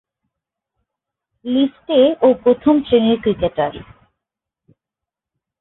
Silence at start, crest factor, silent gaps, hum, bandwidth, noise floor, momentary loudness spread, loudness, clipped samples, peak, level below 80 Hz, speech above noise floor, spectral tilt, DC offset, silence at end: 1.45 s; 16 dB; none; none; 4.1 kHz; -85 dBFS; 9 LU; -16 LUFS; under 0.1%; -2 dBFS; -50 dBFS; 70 dB; -11 dB/octave; under 0.1%; 1.8 s